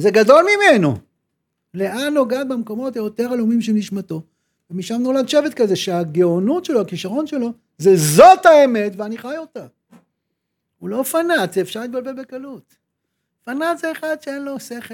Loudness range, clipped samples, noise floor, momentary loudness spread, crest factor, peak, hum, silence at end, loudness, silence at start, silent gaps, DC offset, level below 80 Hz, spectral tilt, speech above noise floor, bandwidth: 10 LU; under 0.1%; -76 dBFS; 19 LU; 18 dB; 0 dBFS; none; 0 s; -16 LUFS; 0 s; none; under 0.1%; -62 dBFS; -5 dB/octave; 59 dB; 19.5 kHz